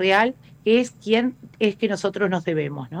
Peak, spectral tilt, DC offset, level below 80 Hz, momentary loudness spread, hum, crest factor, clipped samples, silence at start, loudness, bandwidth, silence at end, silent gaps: -8 dBFS; -5.5 dB/octave; under 0.1%; -64 dBFS; 7 LU; none; 14 dB; under 0.1%; 0 s; -22 LUFS; 11 kHz; 0 s; none